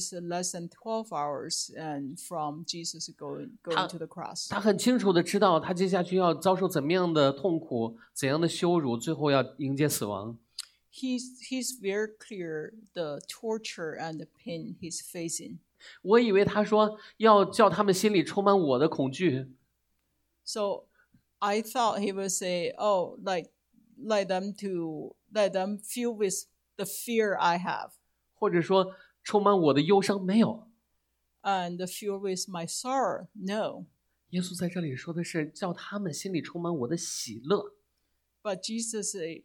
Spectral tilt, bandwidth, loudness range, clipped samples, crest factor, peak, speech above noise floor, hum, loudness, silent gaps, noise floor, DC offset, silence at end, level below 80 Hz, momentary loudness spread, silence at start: -4.5 dB/octave; 18 kHz; 9 LU; under 0.1%; 22 dB; -6 dBFS; 48 dB; none; -29 LUFS; none; -77 dBFS; under 0.1%; 0.05 s; -72 dBFS; 14 LU; 0 s